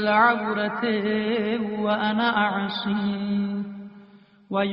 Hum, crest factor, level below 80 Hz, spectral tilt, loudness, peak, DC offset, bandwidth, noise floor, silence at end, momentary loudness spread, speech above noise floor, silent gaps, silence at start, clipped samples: none; 18 dB; -64 dBFS; -3.5 dB/octave; -24 LUFS; -6 dBFS; under 0.1%; 5.6 kHz; -51 dBFS; 0 s; 10 LU; 28 dB; none; 0 s; under 0.1%